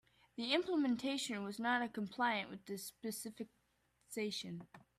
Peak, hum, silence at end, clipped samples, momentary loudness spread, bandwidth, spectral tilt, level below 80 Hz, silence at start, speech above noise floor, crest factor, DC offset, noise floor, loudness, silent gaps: -22 dBFS; none; 0.2 s; under 0.1%; 13 LU; 15.5 kHz; -3.5 dB/octave; -80 dBFS; 0.35 s; 38 dB; 18 dB; under 0.1%; -78 dBFS; -40 LUFS; none